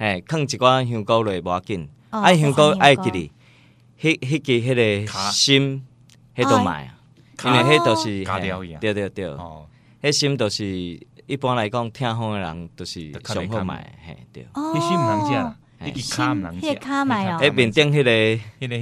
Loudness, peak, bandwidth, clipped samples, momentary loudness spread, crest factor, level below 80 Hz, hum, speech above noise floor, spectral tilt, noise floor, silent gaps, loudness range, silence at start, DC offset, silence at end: -20 LUFS; 0 dBFS; 14.5 kHz; under 0.1%; 17 LU; 20 dB; -50 dBFS; none; 32 dB; -4.5 dB/octave; -52 dBFS; none; 8 LU; 0 s; under 0.1%; 0 s